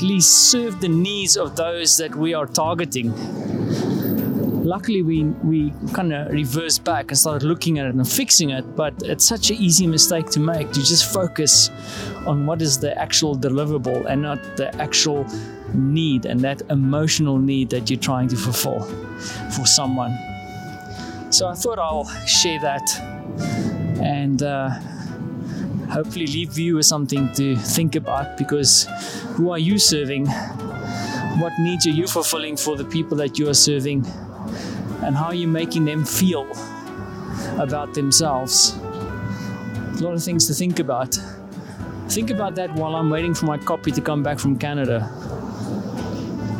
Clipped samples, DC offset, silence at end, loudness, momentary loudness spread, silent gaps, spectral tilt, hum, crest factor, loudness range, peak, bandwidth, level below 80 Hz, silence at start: under 0.1%; under 0.1%; 0 s; -19 LUFS; 15 LU; none; -3.5 dB/octave; none; 20 dB; 7 LU; -2 dBFS; 17 kHz; -48 dBFS; 0 s